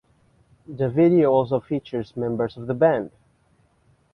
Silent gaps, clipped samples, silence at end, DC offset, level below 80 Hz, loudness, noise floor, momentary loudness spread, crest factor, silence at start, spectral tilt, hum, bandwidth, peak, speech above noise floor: none; under 0.1%; 1.05 s; under 0.1%; -58 dBFS; -22 LUFS; -62 dBFS; 12 LU; 16 dB; 0.7 s; -10 dB/octave; none; 5.6 kHz; -6 dBFS; 41 dB